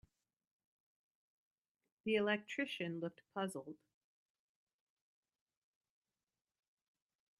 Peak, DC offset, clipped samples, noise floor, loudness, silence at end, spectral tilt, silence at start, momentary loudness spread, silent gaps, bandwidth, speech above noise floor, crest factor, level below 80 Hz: -22 dBFS; under 0.1%; under 0.1%; under -90 dBFS; -41 LUFS; 3.65 s; -5 dB/octave; 2.05 s; 15 LU; none; 12.5 kHz; over 49 dB; 24 dB; -86 dBFS